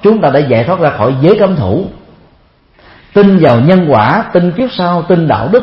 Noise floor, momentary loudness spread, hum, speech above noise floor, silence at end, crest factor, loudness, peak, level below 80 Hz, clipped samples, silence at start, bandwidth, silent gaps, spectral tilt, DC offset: -47 dBFS; 7 LU; none; 39 dB; 0 s; 10 dB; -9 LUFS; 0 dBFS; -42 dBFS; 0.2%; 0 s; 5.8 kHz; none; -10 dB/octave; under 0.1%